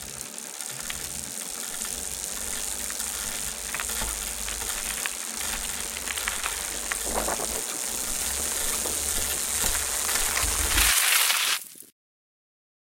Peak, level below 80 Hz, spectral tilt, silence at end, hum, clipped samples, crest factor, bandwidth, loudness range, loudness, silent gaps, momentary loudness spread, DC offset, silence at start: -4 dBFS; -42 dBFS; 0 dB/octave; 0.95 s; none; under 0.1%; 24 dB; 17 kHz; 7 LU; -26 LUFS; none; 11 LU; under 0.1%; 0 s